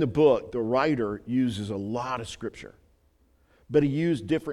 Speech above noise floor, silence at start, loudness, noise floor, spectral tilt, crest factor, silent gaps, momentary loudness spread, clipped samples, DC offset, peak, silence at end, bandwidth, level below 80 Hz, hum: 38 dB; 0 s; -27 LUFS; -64 dBFS; -7 dB/octave; 18 dB; none; 13 LU; under 0.1%; under 0.1%; -8 dBFS; 0 s; 11.5 kHz; -56 dBFS; none